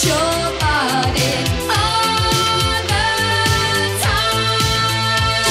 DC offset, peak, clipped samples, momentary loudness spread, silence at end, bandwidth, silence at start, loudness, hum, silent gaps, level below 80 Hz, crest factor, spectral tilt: under 0.1%; -2 dBFS; under 0.1%; 2 LU; 0 s; 16 kHz; 0 s; -16 LUFS; none; none; -32 dBFS; 14 dB; -3 dB/octave